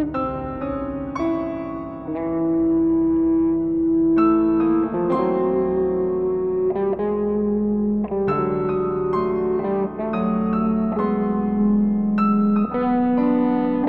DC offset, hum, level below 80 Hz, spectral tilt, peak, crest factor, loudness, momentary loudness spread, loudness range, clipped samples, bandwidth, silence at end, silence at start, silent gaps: 0.2%; none; -44 dBFS; -10.5 dB/octave; -8 dBFS; 12 dB; -21 LUFS; 7 LU; 3 LU; under 0.1%; 4.5 kHz; 0 s; 0 s; none